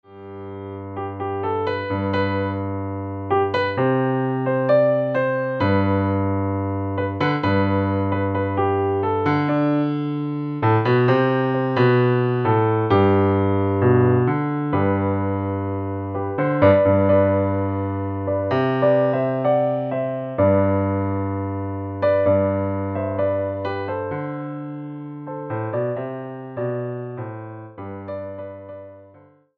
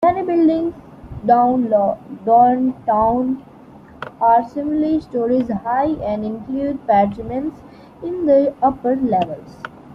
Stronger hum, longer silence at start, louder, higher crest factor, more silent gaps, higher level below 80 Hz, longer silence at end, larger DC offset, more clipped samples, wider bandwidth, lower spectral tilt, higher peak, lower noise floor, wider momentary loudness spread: neither; about the same, 0.1 s vs 0 s; second, -21 LUFS vs -18 LUFS; about the same, 18 dB vs 16 dB; neither; second, -60 dBFS vs -48 dBFS; first, 0.55 s vs 0 s; neither; neither; second, 5.2 kHz vs 5.8 kHz; about the same, -10 dB/octave vs -9 dB/octave; about the same, -2 dBFS vs -2 dBFS; first, -51 dBFS vs -42 dBFS; about the same, 15 LU vs 13 LU